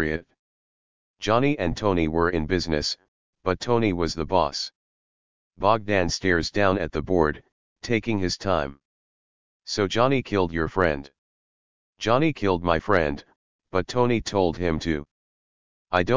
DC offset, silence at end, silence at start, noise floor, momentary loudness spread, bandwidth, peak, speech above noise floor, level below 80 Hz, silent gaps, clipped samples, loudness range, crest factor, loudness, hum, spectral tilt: 1%; 0 s; 0 s; under -90 dBFS; 9 LU; 7.6 kHz; -4 dBFS; over 67 dB; -42 dBFS; 0.39-1.14 s, 3.08-3.33 s, 4.75-5.51 s, 7.52-7.76 s, 8.85-9.60 s, 11.18-11.93 s, 13.36-13.59 s, 15.11-15.85 s; under 0.1%; 2 LU; 20 dB; -24 LUFS; none; -5.5 dB/octave